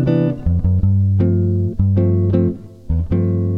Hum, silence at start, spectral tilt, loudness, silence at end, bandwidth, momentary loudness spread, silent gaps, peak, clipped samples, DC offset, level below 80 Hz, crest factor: none; 0 s; -12 dB/octave; -17 LUFS; 0 s; 3.8 kHz; 6 LU; none; -2 dBFS; under 0.1%; under 0.1%; -30 dBFS; 14 dB